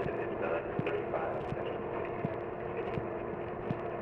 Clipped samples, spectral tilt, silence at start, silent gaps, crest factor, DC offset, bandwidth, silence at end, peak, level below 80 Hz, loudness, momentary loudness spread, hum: under 0.1%; -9 dB/octave; 0 s; none; 16 dB; under 0.1%; 6 kHz; 0 s; -20 dBFS; -56 dBFS; -36 LUFS; 4 LU; none